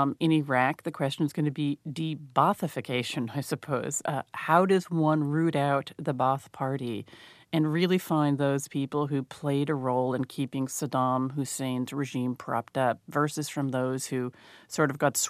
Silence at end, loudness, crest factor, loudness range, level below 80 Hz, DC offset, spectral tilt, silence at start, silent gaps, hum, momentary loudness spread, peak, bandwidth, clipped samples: 0 s; -28 LUFS; 22 dB; 3 LU; -74 dBFS; under 0.1%; -5.5 dB/octave; 0 s; none; none; 8 LU; -6 dBFS; 15 kHz; under 0.1%